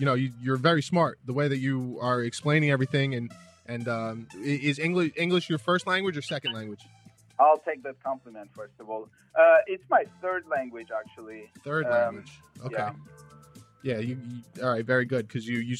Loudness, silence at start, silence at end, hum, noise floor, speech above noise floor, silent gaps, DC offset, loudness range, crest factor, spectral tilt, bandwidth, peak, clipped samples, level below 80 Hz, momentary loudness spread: -27 LUFS; 0 s; 0 s; none; -52 dBFS; 25 dB; none; under 0.1%; 6 LU; 20 dB; -6 dB/octave; 12 kHz; -8 dBFS; under 0.1%; -74 dBFS; 18 LU